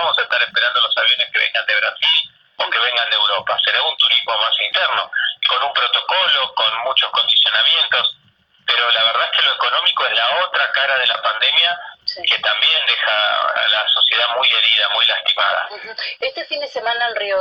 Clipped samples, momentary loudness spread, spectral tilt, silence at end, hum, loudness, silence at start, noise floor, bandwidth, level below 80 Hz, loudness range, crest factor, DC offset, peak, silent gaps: under 0.1%; 8 LU; -0.5 dB/octave; 0 s; none; -15 LUFS; 0 s; -56 dBFS; 7.6 kHz; -68 dBFS; 1 LU; 14 dB; under 0.1%; -4 dBFS; none